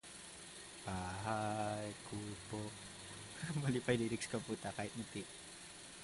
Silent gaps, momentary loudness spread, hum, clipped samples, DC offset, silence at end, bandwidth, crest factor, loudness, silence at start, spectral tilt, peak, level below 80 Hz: none; 14 LU; none; under 0.1%; under 0.1%; 0 s; 11.5 kHz; 22 dB; -43 LUFS; 0.05 s; -4.5 dB/octave; -22 dBFS; -66 dBFS